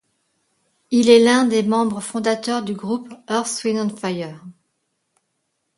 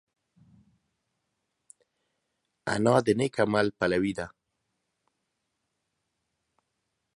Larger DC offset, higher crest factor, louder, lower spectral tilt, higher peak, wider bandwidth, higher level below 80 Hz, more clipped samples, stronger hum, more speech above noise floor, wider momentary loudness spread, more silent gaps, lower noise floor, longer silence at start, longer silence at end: neither; about the same, 20 dB vs 24 dB; first, -19 LUFS vs -27 LUFS; second, -4.5 dB/octave vs -6 dB/octave; first, 0 dBFS vs -6 dBFS; about the same, 11.5 kHz vs 11.5 kHz; about the same, -66 dBFS vs -62 dBFS; neither; neither; about the same, 55 dB vs 55 dB; about the same, 14 LU vs 14 LU; neither; second, -73 dBFS vs -81 dBFS; second, 0.9 s vs 2.65 s; second, 1.25 s vs 2.85 s